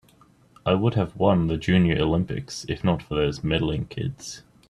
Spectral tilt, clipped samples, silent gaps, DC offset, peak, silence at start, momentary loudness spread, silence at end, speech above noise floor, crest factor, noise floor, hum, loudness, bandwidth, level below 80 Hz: -6.5 dB/octave; under 0.1%; none; under 0.1%; -4 dBFS; 0.65 s; 11 LU; 0.3 s; 33 dB; 20 dB; -56 dBFS; none; -24 LUFS; 11.5 kHz; -44 dBFS